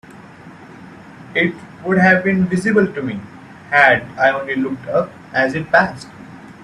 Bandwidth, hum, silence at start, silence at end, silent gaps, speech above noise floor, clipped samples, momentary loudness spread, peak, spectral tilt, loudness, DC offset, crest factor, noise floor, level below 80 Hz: 11 kHz; none; 0.1 s; 0 s; none; 23 dB; under 0.1%; 14 LU; 0 dBFS; -6.5 dB/octave; -16 LUFS; under 0.1%; 18 dB; -39 dBFS; -54 dBFS